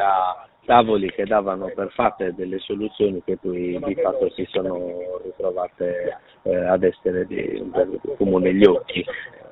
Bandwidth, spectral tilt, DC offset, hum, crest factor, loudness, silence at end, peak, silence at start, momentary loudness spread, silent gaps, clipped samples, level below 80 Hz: 4.3 kHz; -4.5 dB/octave; under 0.1%; none; 22 dB; -22 LUFS; 0 s; 0 dBFS; 0 s; 12 LU; none; under 0.1%; -52 dBFS